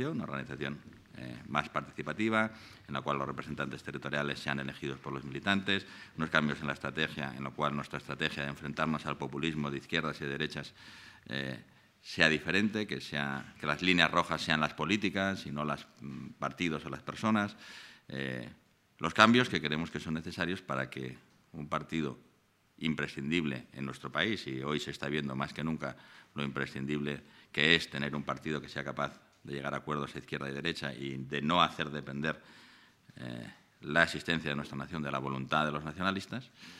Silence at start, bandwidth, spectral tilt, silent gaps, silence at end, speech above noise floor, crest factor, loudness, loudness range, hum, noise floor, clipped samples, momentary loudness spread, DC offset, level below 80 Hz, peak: 0 s; 14.5 kHz; -5 dB/octave; none; 0 s; 35 dB; 30 dB; -34 LUFS; 6 LU; none; -69 dBFS; under 0.1%; 16 LU; under 0.1%; -64 dBFS; -4 dBFS